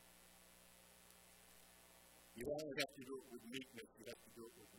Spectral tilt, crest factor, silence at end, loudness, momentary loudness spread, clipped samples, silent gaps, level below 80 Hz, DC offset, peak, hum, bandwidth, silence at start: -3 dB/octave; 28 dB; 0 s; -50 LUFS; 19 LU; under 0.1%; none; -78 dBFS; under 0.1%; -24 dBFS; 60 Hz at -75 dBFS; 16.5 kHz; 0 s